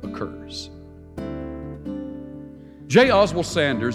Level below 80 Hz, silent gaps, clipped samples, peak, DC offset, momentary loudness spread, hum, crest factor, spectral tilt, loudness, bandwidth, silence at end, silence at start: -46 dBFS; none; under 0.1%; -2 dBFS; under 0.1%; 23 LU; none; 20 dB; -5 dB/octave; -21 LUFS; 13 kHz; 0 s; 0 s